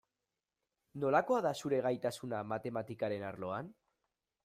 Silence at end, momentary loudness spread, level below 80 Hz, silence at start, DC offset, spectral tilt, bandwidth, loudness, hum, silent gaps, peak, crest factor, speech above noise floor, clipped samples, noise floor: 0.7 s; 10 LU; -76 dBFS; 0.95 s; under 0.1%; -6 dB/octave; 15.5 kHz; -36 LUFS; none; none; -16 dBFS; 22 dB; over 54 dB; under 0.1%; under -90 dBFS